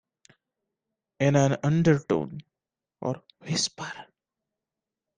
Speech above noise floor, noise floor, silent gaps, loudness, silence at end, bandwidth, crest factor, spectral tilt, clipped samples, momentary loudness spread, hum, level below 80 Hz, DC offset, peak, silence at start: 64 dB; -90 dBFS; none; -26 LUFS; 1.15 s; 9.8 kHz; 20 dB; -5.5 dB/octave; under 0.1%; 16 LU; none; -62 dBFS; under 0.1%; -8 dBFS; 1.2 s